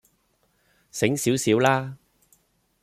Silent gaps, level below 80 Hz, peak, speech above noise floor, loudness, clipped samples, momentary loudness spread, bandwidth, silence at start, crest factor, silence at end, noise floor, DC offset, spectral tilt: none; -64 dBFS; -6 dBFS; 46 dB; -22 LUFS; under 0.1%; 15 LU; 15.5 kHz; 0.95 s; 20 dB; 0.85 s; -68 dBFS; under 0.1%; -4.5 dB/octave